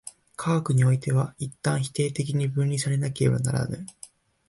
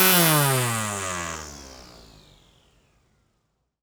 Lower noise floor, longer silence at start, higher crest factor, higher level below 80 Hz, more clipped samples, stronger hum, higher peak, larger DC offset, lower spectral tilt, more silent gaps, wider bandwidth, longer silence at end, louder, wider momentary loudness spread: second, -51 dBFS vs -73 dBFS; about the same, 0.05 s vs 0 s; second, 16 dB vs 24 dB; about the same, -56 dBFS vs -54 dBFS; neither; neither; second, -10 dBFS vs -2 dBFS; neither; first, -6 dB/octave vs -3 dB/octave; neither; second, 11.5 kHz vs over 20 kHz; second, 0.45 s vs 2 s; second, -25 LUFS vs -21 LUFS; second, 11 LU vs 26 LU